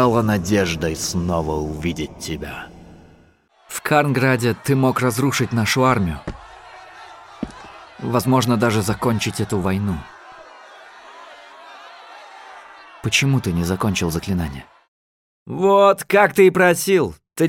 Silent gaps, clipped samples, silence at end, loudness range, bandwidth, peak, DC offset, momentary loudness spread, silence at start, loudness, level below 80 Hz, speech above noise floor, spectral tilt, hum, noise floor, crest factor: 14.88-15.46 s; under 0.1%; 0 s; 8 LU; 17 kHz; -2 dBFS; under 0.1%; 25 LU; 0 s; -19 LUFS; -42 dBFS; 36 dB; -5 dB/octave; none; -54 dBFS; 18 dB